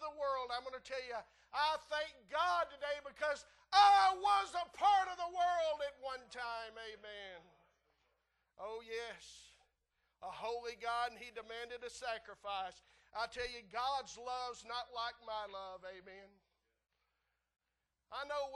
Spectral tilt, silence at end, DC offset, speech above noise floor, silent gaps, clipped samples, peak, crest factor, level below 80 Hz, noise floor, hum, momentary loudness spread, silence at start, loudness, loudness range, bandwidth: -1 dB/octave; 0 s; under 0.1%; 50 dB; none; under 0.1%; -18 dBFS; 22 dB; -72 dBFS; -88 dBFS; none; 18 LU; 0 s; -38 LUFS; 16 LU; 12 kHz